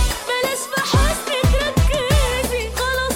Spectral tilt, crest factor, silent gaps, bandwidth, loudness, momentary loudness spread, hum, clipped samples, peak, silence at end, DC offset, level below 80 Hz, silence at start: -4 dB/octave; 12 dB; none; 17 kHz; -19 LUFS; 4 LU; none; under 0.1%; -6 dBFS; 0 s; under 0.1%; -22 dBFS; 0 s